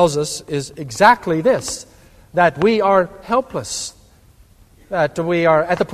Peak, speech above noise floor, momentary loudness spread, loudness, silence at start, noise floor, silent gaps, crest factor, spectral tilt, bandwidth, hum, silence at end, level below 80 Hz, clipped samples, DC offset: 0 dBFS; 32 dB; 12 LU; -17 LUFS; 0 s; -49 dBFS; none; 18 dB; -4.5 dB/octave; 14.5 kHz; none; 0 s; -48 dBFS; under 0.1%; under 0.1%